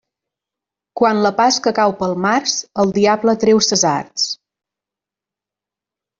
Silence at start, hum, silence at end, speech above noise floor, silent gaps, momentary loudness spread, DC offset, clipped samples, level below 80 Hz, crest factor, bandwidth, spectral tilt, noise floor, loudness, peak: 0.95 s; 50 Hz at -40 dBFS; 1.85 s; 72 dB; none; 7 LU; under 0.1%; under 0.1%; -58 dBFS; 16 dB; 7.8 kHz; -3.5 dB/octave; -87 dBFS; -16 LUFS; -2 dBFS